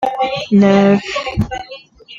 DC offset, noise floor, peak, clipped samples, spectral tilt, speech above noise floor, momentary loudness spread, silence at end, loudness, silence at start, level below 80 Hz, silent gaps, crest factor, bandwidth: under 0.1%; -36 dBFS; -2 dBFS; under 0.1%; -7 dB/octave; 23 dB; 15 LU; 0 s; -14 LUFS; 0 s; -38 dBFS; none; 14 dB; 7.6 kHz